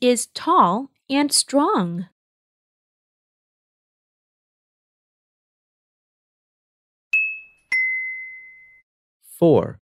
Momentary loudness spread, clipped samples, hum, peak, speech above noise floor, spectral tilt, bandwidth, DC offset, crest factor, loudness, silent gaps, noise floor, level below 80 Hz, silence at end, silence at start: 16 LU; under 0.1%; none; -2 dBFS; 26 dB; -3.5 dB/octave; 16 kHz; under 0.1%; 22 dB; -20 LUFS; 2.12-7.11 s, 8.83-9.20 s; -44 dBFS; -70 dBFS; 0.15 s; 0 s